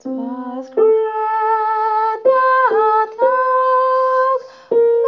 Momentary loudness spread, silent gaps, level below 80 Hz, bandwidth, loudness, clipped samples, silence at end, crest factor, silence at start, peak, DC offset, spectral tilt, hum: 10 LU; none; -74 dBFS; 6 kHz; -16 LUFS; under 0.1%; 0 s; 12 dB; 0.05 s; -2 dBFS; under 0.1%; -5.5 dB/octave; none